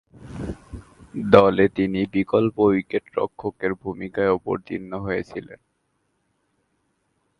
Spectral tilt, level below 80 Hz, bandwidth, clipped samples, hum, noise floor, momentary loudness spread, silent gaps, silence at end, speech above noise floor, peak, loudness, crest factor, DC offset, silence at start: -8 dB/octave; -48 dBFS; 10.5 kHz; under 0.1%; none; -71 dBFS; 20 LU; none; 1.85 s; 50 dB; 0 dBFS; -22 LUFS; 24 dB; under 0.1%; 0.25 s